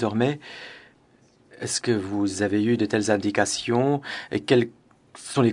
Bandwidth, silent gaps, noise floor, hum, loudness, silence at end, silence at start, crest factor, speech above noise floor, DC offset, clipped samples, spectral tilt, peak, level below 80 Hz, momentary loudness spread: 11 kHz; none; -58 dBFS; none; -24 LUFS; 0 s; 0 s; 20 dB; 35 dB; under 0.1%; under 0.1%; -5 dB/octave; -4 dBFS; -66 dBFS; 13 LU